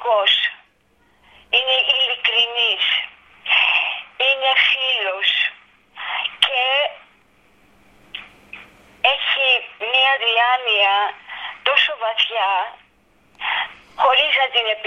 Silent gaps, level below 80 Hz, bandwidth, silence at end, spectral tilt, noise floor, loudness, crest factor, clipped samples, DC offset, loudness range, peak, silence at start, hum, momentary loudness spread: none; -64 dBFS; 10 kHz; 0 s; 0 dB/octave; -59 dBFS; -17 LUFS; 20 dB; under 0.1%; under 0.1%; 5 LU; 0 dBFS; 0 s; none; 12 LU